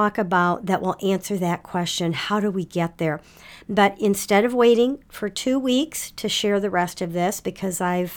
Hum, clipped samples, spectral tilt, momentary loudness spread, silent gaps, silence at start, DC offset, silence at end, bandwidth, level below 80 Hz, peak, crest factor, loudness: none; under 0.1%; -4.5 dB/octave; 8 LU; none; 0 s; under 0.1%; 0 s; 19 kHz; -56 dBFS; -4 dBFS; 18 dB; -22 LUFS